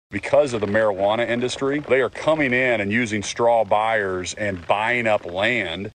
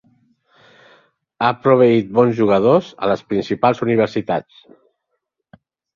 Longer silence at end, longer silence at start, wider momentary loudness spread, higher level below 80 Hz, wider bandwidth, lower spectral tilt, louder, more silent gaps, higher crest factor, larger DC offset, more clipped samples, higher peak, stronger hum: second, 0.05 s vs 1.55 s; second, 0.1 s vs 1.4 s; second, 5 LU vs 8 LU; about the same, -54 dBFS vs -58 dBFS; first, 9.6 kHz vs 7.2 kHz; second, -4.5 dB/octave vs -8 dB/octave; second, -21 LUFS vs -16 LUFS; neither; about the same, 18 dB vs 16 dB; neither; neither; about the same, -4 dBFS vs -2 dBFS; neither